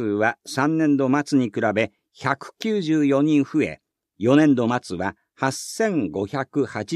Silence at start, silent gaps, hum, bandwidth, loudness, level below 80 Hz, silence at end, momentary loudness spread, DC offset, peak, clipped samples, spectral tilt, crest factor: 0 s; none; none; 13.5 kHz; -22 LUFS; -62 dBFS; 0 s; 8 LU; under 0.1%; -4 dBFS; under 0.1%; -6 dB/octave; 18 dB